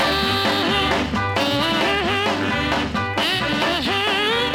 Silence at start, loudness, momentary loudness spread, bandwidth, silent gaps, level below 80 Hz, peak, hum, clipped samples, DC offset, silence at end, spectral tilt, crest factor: 0 s; -19 LUFS; 3 LU; 17.5 kHz; none; -40 dBFS; -6 dBFS; none; under 0.1%; under 0.1%; 0 s; -4 dB/octave; 14 dB